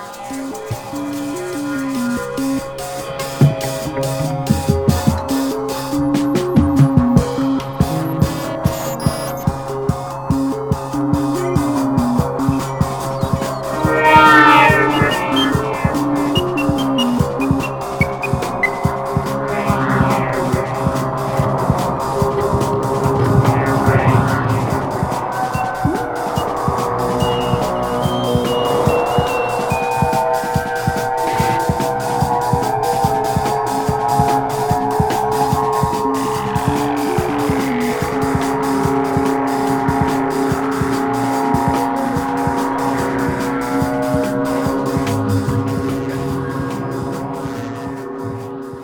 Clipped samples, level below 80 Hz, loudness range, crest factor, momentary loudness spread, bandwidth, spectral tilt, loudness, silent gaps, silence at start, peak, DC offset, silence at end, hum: under 0.1%; -36 dBFS; 7 LU; 16 dB; 7 LU; 20 kHz; -6 dB/octave; -17 LUFS; none; 0 s; 0 dBFS; under 0.1%; 0 s; none